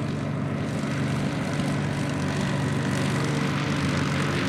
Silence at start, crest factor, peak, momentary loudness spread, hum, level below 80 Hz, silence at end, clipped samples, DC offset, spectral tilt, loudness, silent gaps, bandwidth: 0 s; 12 dB; -14 dBFS; 3 LU; none; -50 dBFS; 0 s; under 0.1%; under 0.1%; -6 dB/octave; -26 LUFS; none; 13.5 kHz